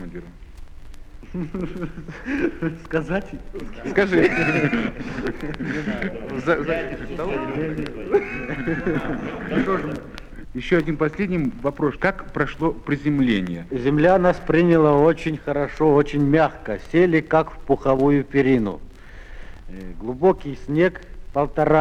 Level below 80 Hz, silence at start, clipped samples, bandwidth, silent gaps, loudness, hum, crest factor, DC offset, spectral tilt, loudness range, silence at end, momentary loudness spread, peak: -38 dBFS; 0 s; under 0.1%; 10.5 kHz; none; -21 LUFS; none; 18 dB; under 0.1%; -8 dB/octave; 7 LU; 0 s; 15 LU; -4 dBFS